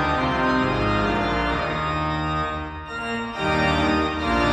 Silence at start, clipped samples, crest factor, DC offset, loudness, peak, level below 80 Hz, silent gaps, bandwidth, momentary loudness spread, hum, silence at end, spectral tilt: 0 s; under 0.1%; 14 dB; under 0.1%; -23 LUFS; -8 dBFS; -36 dBFS; none; 11 kHz; 7 LU; none; 0 s; -6 dB/octave